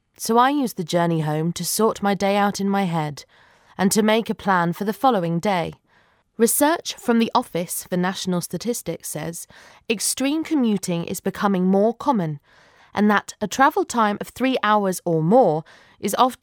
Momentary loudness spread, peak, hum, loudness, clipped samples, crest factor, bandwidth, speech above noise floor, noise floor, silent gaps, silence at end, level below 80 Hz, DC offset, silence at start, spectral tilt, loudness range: 10 LU; -2 dBFS; none; -21 LUFS; under 0.1%; 20 dB; over 20 kHz; 39 dB; -60 dBFS; none; 0.05 s; -62 dBFS; under 0.1%; 0.2 s; -4.5 dB/octave; 4 LU